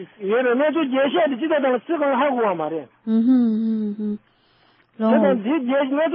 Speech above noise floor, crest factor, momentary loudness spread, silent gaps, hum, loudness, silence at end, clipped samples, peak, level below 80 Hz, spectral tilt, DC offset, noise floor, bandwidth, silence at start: 39 dB; 14 dB; 8 LU; none; none; -20 LUFS; 0 s; under 0.1%; -6 dBFS; -76 dBFS; -11 dB/octave; under 0.1%; -58 dBFS; 4.5 kHz; 0 s